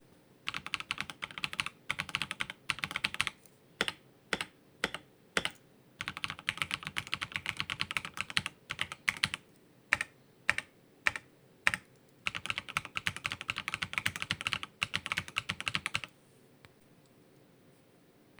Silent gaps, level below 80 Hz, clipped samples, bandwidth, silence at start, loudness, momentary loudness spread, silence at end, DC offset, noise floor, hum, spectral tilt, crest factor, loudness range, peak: none; -66 dBFS; under 0.1%; over 20 kHz; 0.45 s; -36 LUFS; 7 LU; 2.3 s; under 0.1%; -63 dBFS; none; -1.5 dB/octave; 34 dB; 3 LU; -4 dBFS